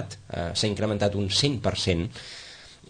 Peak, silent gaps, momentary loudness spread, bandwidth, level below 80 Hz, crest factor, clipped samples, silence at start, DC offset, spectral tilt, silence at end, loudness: -8 dBFS; none; 16 LU; 9.8 kHz; -48 dBFS; 20 dB; under 0.1%; 0 s; under 0.1%; -4.5 dB/octave; 0.15 s; -26 LUFS